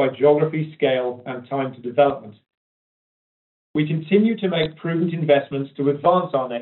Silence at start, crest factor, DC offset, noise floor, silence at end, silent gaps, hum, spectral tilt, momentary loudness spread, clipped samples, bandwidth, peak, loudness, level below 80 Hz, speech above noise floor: 0 s; 18 dB; under 0.1%; under -90 dBFS; 0 s; 2.57-3.74 s; none; -5.5 dB/octave; 10 LU; under 0.1%; 4.2 kHz; -4 dBFS; -21 LUFS; -62 dBFS; over 70 dB